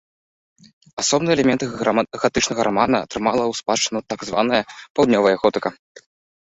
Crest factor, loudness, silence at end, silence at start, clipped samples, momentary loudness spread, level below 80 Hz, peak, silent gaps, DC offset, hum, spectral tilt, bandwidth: 18 dB; -20 LUFS; 0.75 s; 0.95 s; under 0.1%; 8 LU; -52 dBFS; -2 dBFS; 4.90-4.95 s; under 0.1%; none; -3.5 dB/octave; 8.2 kHz